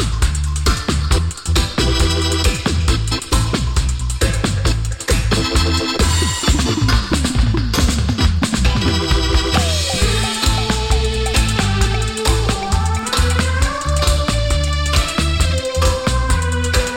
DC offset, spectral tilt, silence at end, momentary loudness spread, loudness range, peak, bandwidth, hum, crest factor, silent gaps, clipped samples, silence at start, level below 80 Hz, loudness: under 0.1%; -4 dB/octave; 0 s; 3 LU; 1 LU; -2 dBFS; 17 kHz; none; 14 dB; none; under 0.1%; 0 s; -20 dBFS; -17 LUFS